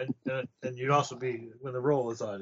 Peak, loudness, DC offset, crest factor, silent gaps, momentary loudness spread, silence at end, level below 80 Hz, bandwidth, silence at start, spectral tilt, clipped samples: -12 dBFS; -32 LUFS; under 0.1%; 20 dB; none; 11 LU; 0 s; -74 dBFS; 8 kHz; 0 s; -5.5 dB/octave; under 0.1%